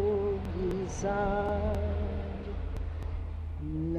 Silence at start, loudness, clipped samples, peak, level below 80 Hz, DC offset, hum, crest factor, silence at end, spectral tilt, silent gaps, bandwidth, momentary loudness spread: 0 s; -34 LUFS; under 0.1%; -18 dBFS; -38 dBFS; under 0.1%; none; 14 dB; 0 s; -7.5 dB/octave; none; 9 kHz; 8 LU